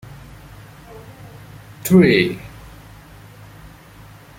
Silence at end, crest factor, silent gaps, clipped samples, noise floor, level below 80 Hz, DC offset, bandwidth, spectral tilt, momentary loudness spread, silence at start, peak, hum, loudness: 1.9 s; 20 dB; none; under 0.1%; -43 dBFS; -46 dBFS; under 0.1%; 16.5 kHz; -6 dB/octave; 29 LU; 0.1 s; -2 dBFS; none; -15 LUFS